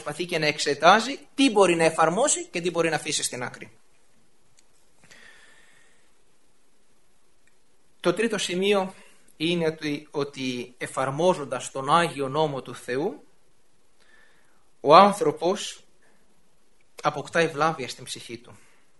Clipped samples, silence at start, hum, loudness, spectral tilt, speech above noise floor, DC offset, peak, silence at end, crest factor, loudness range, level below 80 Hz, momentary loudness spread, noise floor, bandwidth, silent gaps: under 0.1%; 0 s; none; -24 LUFS; -3.5 dB/octave; 43 dB; 0.2%; 0 dBFS; 0.45 s; 26 dB; 9 LU; -66 dBFS; 16 LU; -66 dBFS; 11.5 kHz; none